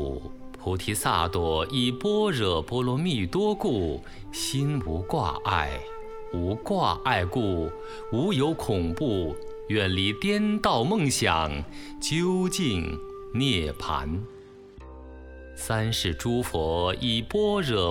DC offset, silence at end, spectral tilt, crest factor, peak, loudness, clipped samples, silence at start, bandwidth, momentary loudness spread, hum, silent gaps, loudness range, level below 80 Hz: under 0.1%; 0 s; -5 dB/octave; 18 dB; -8 dBFS; -27 LUFS; under 0.1%; 0 s; 18 kHz; 14 LU; none; none; 4 LU; -42 dBFS